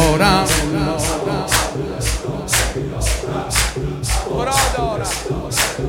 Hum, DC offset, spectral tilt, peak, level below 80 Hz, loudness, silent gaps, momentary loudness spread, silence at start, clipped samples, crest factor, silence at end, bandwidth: none; under 0.1%; -3.5 dB/octave; 0 dBFS; -26 dBFS; -18 LUFS; none; 7 LU; 0 s; under 0.1%; 18 dB; 0 s; 17 kHz